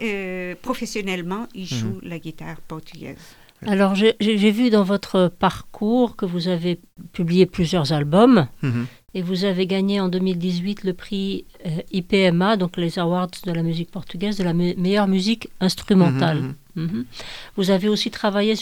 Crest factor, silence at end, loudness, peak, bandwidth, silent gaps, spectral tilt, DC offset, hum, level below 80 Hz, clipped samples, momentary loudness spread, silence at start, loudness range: 18 dB; 0 s; -21 LUFS; -4 dBFS; 18 kHz; none; -6.5 dB/octave; under 0.1%; none; -48 dBFS; under 0.1%; 14 LU; 0 s; 4 LU